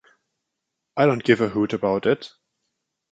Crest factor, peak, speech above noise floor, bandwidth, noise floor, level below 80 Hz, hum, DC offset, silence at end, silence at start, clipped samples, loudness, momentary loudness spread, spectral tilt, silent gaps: 20 dB; -2 dBFS; 60 dB; 9 kHz; -81 dBFS; -60 dBFS; none; under 0.1%; 0.85 s; 0.95 s; under 0.1%; -21 LUFS; 10 LU; -7 dB/octave; none